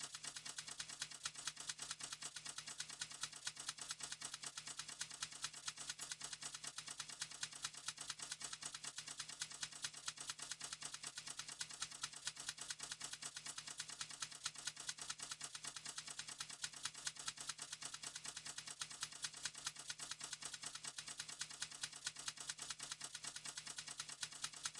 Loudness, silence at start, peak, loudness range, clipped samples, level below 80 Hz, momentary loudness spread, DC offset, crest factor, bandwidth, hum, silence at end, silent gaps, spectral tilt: -48 LUFS; 0 s; -26 dBFS; 0 LU; under 0.1%; -82 dBFS; 3 LU; under 0.1%; 24 dB; 12 kHz; none; 0 s; none; 1 dB/octave